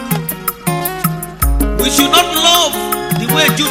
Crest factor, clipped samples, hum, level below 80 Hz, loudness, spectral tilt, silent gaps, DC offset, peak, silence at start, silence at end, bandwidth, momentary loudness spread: 14 dB; under 0.1%; none; -24 dBFS; -13 LUFS; -3 dB/octave; none; under 0.1%; 0 dBFS; 0 s; 0 s; 17 kHz; 9 LU